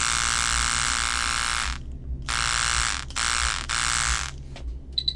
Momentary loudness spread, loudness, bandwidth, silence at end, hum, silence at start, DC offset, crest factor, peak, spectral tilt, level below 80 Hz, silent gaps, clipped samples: 13 LU; -24 LUFS; 11.5 kHz; 0 s; none; 0 s; under 0.1%; 18 dB; -8 dBFS; -0.5 dB/octave; -34 dBFS; none; under 0.1%